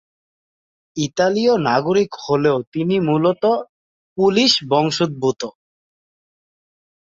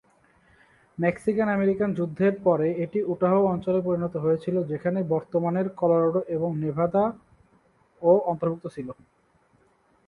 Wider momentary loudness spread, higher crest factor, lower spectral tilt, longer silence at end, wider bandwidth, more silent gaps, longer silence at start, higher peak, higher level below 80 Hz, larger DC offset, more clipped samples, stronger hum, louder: first, 10 LU vs 7 LU; about the same, 18 dB vs 18 dB; second, -5 dB/octave vs -9.5 dB/octave; first, 1.5 s vs 1.15 s; second, 7.8 kHz vs 11 kHz; first, 2.67-2.72 s, 3.69-4.16 s vs none; about the same, 0.95 s vs 1 s; first, -2 dBFS vs -8 dBFS; about the same, -60 dBFS vs -62 dBFS; neither; neither; neither; first, -18 LUFS vs -25 LUFS